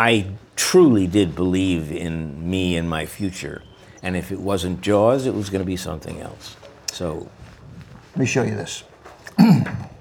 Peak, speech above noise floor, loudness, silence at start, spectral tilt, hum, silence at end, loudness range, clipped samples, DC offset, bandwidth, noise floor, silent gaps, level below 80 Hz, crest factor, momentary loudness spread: 0 dBFS; 23 dB; -21 LUFS; 0 s; -5.5 dB/octave; none; 0.05 s; 8 LU; under 0.1%; under 0.1%; 19.5 kHz; -43 dBFS; none; -46 dBFS; 20 dB; 19 LU